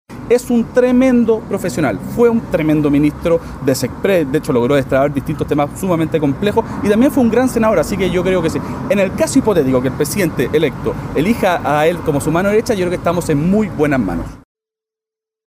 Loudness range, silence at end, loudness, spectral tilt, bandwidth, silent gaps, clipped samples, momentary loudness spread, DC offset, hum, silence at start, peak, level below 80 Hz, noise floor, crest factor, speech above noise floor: 2 LU; 1.1 s; -15 LUFS; -6.5 dB/octave; 16 kHz; none; under 0.1%; 5 LU; under 0.1%; none; 0.1 s; -2 dBFS; -38 dBFS; -87 dBFS; 14 dB; 72 dB